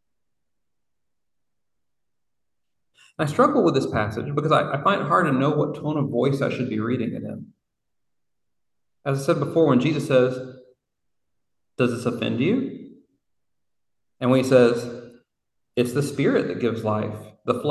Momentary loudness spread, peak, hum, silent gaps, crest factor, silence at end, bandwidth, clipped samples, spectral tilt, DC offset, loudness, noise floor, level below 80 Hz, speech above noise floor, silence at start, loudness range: 15 LU; -4 dBFS; none; none; 20 dB; 0 s; 12.5 kHz; under 0.1%; -7 dB/octave; under 0.1%; -22 LUFS; -85 dBFS; -58 dBFS; 64 dB; 3.2 s; 7 LU